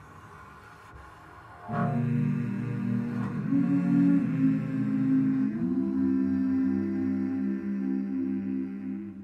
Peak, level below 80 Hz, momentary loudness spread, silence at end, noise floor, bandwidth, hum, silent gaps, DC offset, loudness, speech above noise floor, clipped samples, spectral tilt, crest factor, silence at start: -14 dBFS; -62 dBFS; 23 LU; 0 s; -49 dBFS; 5.6 kHz; none; none; under 0.1%; -28 LUFS; 22 dB; under 0.1%; -10 dB/octave; 14 dB; 0 s